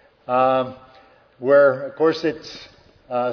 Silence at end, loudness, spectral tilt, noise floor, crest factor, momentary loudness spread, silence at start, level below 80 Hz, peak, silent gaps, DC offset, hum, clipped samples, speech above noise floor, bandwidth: 0 s; -20 LUFS; -6.5 dB/octave; -51 dBFS; 16 dB; 18 LU; 0.3 s; -64 dBFS; -4 dBFS; none; under 0.1%; none; under 0.1%; 33 dB; 5.4 kHz